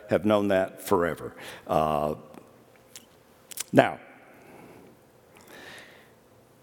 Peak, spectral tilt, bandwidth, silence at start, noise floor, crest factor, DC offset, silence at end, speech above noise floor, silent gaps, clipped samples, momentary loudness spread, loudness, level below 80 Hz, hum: 0 dBFS; -5.5 dB/octave; 19 kHz; 0.05 s; -57 dBFS; 28 dB; under 0.1%; 0.8 s; 32 dB; none; under 0.1%; 26 LU; -26 LUFS; -60 dBFS; none